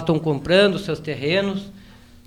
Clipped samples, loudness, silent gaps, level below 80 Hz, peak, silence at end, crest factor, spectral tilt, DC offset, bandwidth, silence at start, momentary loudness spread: under 0.1%; -20 LUFS; none; -48 dBFS; -6 dBFS; 0.4 s; 16 dB; -6 dB/octave; under 0.1%; 13.5 kHz; 0 s; 12 LU